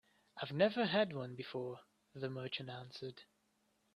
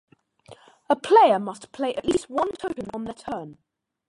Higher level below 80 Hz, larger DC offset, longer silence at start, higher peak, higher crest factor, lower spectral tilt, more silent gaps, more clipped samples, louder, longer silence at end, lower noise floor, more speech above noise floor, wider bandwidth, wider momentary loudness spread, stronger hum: second, -82 dBFS vs -58 dBFS; neither; second, 0.35 s vs 0.5 s; second, -20 dBFS vs -4 dBFS; about the same, 22 dB vs 20 dB; first, -7 dB/octave vs -5 dB/octave; neither; neither; second, -40 LUFS vs -23 LUFS; first, 0.75 s vs 0.55 s; first, -79 dBFS vs -51 dBFS; first, 39 dB vs 28 dB; about the same, 11 kHz vs 11.5 kHz; about the same, 20 LU vs 18 LU; neither